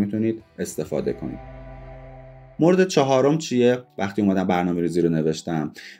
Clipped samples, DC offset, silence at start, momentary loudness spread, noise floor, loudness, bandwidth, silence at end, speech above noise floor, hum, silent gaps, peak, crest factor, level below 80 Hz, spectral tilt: under 0.1%; under 0.1%; 0 s; 23 LU; -43 dBFS; -22 LUFS; 16 kHz; 0.05 s; 22 dB; none; none; -4 dBFS; 18 dB; -50 dBFS; -6 dB/octave